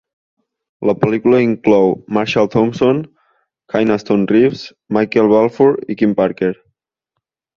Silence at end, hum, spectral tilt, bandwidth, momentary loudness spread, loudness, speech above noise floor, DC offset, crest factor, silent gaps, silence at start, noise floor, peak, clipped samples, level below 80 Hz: 1.05 s; none; -7.5 dB/octave; 7.2 kHz; 9 LU; -15 LUFS; 63 dB; under 0.1%; 14 dB; none; 0.8 s; -77 dBFS; 0 dBFS; under 0.1%; -52 dBFS